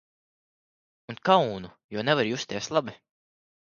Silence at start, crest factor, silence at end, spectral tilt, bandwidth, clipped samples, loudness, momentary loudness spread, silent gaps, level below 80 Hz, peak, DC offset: 1.1 s; 24 dB; 0.8 s; -4.5 dB/octave; 7.2 kHz; under 0.1%; -26 LUFS; 17 LU; 1.84-1.89 s; -66 dBFS; -4 dBFS; under 0.1%